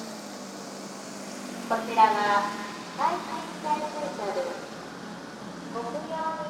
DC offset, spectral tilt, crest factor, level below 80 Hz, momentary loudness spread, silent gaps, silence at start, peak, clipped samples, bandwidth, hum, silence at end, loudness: under 0.1%; -3.5 dB/octave; 22 dB; -70 dBFS; 18 LU; none; 0 s; -8 dBFS; under 0.1%; 16.5 kHz; none; 0 s; -30 LUFS